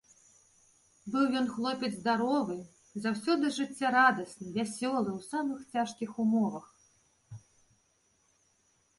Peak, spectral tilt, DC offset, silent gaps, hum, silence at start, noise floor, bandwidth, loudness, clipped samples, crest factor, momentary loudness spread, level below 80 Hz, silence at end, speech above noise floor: -12 dBFS; -4.5 dB/octave; under 0.1%; none; none; 1.05 s; -72 dBFS; 11.5 kHz; -31 LUFS; under 0.1%; 22 dB; 18 LU; -74 dBFS; 1.6 s; 41 dB